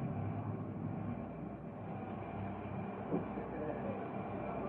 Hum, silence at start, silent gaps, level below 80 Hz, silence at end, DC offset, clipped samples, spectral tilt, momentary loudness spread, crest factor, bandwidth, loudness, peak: none; 0 s; none; -60 dBFS; 0 s; under 0.1%; under 0.1%; -8.5 dB/octave; 5 LU; 18 dB; 4.1 kHz; -42 LUFS; -24 dBFS